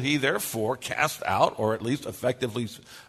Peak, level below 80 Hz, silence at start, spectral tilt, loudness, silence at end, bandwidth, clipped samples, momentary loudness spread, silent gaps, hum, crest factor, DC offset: -6 dBFS; -62 dBFS; 0 s; -4.5 dB/octave; -27 LUFS; 0.05 s; 13.5 kHz; under 0.1%; 6 LU; none; none; 22 dB; under 0.1%